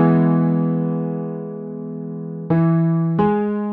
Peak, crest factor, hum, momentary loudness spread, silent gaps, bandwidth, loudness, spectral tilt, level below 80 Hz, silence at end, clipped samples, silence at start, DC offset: -4 dBFS; 14 dB; none; 13 LU; none; 3.4 kHz; -20 LUFS; -13 dB/octave; -56 dBFS; 0 s; under 0.1%; 0 s; under 0.1%